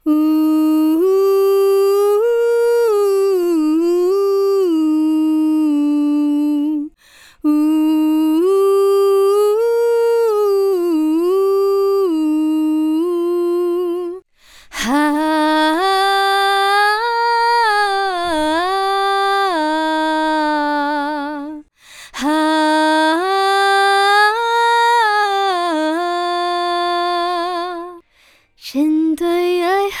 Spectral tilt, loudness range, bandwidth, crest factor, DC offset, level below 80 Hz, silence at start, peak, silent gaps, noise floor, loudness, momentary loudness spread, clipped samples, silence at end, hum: -2.5 dB/octave; 4 LU; 14.5 kHz; 12 dB; under 0.1%; -54 dBFS; 0.05 s; -4 dBFS; none; -53 dBFS; -15 LUFS; 6 LU; under 0.1%; 0 s; none